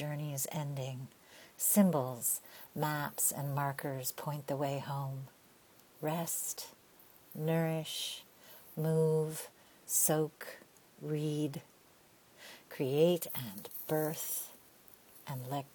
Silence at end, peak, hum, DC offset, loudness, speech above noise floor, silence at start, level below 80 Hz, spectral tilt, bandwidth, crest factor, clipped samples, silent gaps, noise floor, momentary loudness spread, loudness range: 0.05 s; -16 dBFS; none; under 0.1%; -35 LUFS; 29 dB; 0 s; -76 dBFS; -4.5 dB/octave; 19.5 kHz; 22 dB; under 0.1%; none; -64 dBFS; 20 LU; 5 LU